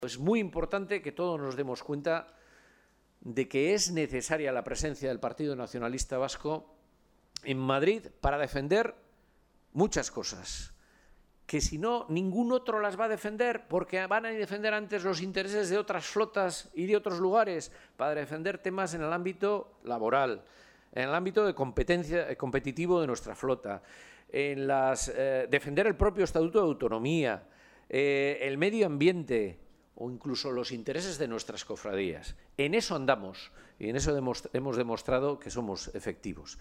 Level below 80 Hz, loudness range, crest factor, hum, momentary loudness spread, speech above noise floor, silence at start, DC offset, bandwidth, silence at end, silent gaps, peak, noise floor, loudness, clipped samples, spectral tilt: -50 dBFS; 5 LU; 20 dB; none; 11 LU; 35 dB; 0 s; under 0.1%; 14.5 kHz; 0 s; none; -12 dBFS; -66 dBFS; -31 LUFS; under 0.1%; -4.5 dB/octave